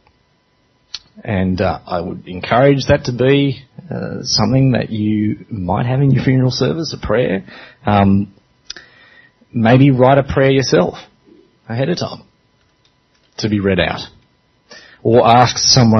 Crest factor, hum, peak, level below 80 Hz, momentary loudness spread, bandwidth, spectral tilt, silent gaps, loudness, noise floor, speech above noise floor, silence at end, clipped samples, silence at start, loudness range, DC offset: 16 dB; none; 0 dBFS; -42 dBFS; 19 LU; 6.4 kHz; -5.5 dB/octave; none; -15 LUFS; -59 dBFS; 45 dB; 0 s; under 0.1%; 0.95 s; 7 LU; under 0.1%